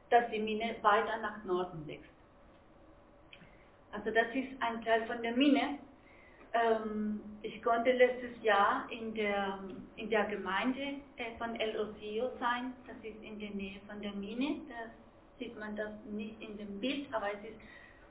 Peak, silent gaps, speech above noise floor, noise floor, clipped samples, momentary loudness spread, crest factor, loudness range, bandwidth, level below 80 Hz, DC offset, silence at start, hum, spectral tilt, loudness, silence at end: -14 dBFS; none; 26 dB; -60 dBFS; under 0.1%; 17 LU; 22 dB; 9 LU; 4 kHz; -64 dBFS; under 0.1%; 0.1 s; none; -2.5 dB/octave; -34 LUFS; 0.05 s